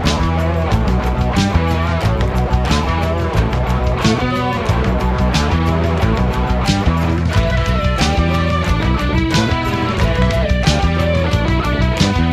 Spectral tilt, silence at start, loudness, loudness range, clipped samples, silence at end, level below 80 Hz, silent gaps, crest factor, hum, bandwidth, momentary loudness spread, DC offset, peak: -6 dB/octave; 0 s; -16 LUFS; 1 LU; under 0.1%; 0 s; -20 dBFS; none; 14 dB; none; 13.5 kHz; 2 LU; under 0.1%; 0 dBFS